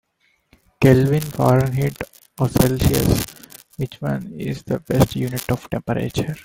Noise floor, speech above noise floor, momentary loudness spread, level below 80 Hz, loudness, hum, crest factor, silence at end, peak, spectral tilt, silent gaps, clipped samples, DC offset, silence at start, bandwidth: -64 dBFS; 45 dB; 14 LU; -38 dBFS; -20 LUFS; none; 20 dB; 0.05 s; 0 dBFS; -6.5 dB/octave; none; under 0.1%; under 0.1%; 0.8 s; 17 kHz